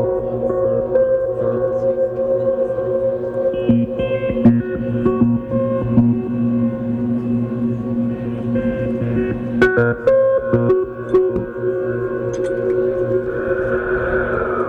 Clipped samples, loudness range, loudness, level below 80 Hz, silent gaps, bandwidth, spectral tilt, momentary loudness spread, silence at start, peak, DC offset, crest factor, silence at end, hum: under 0.1%; 2 LU; -18 LUFS; -40 dBFS; none; 6.8 kHz; -9.5 dB/octave; 6 LU; 0 s; -2 dBFS; under 0.1%; 14 dB; 0 s; none